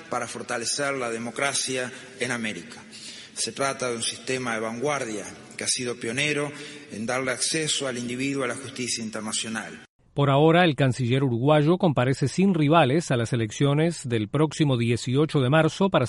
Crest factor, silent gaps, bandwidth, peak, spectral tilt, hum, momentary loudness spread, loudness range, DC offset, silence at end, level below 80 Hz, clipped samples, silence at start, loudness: 18 dB; 9.89-9.99 s; 11.5 kHz; -6 dBFS; -4.5 dB/octave; none; 13 LU; 7 LU; under 0.1%; 0 s; -60 dBFS; under 0.1%; 0 s; -24 LUFS